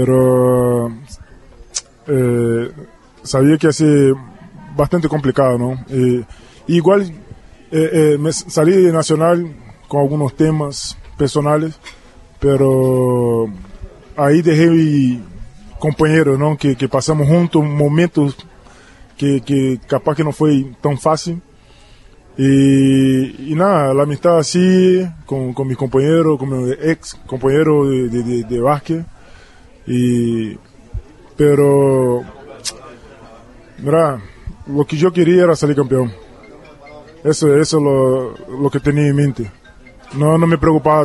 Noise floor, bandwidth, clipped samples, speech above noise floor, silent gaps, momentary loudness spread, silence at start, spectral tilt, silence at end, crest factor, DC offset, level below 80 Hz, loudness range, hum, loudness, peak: -44 dBFS; 12 kHz; under 0.1%; 30 dB; none; 14 LU; 0 s; -7 dB/octave; 0 s; 14 dB; under 0.1%; -40 dBFS; 3 LU; none; -15 LUFS; 0 dBFS